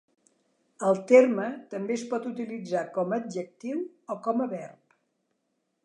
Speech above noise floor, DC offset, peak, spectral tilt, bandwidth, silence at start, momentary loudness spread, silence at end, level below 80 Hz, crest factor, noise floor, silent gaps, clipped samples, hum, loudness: 51 dB; under 0.1%; -6 dBFS; -6 dB/octave; 10 kHz; 0.8 s; 16 LU; 1.1 s; -86 dBFS; 22 dB; -78 dBFS; none; under 0.1%; none; -27 LUFS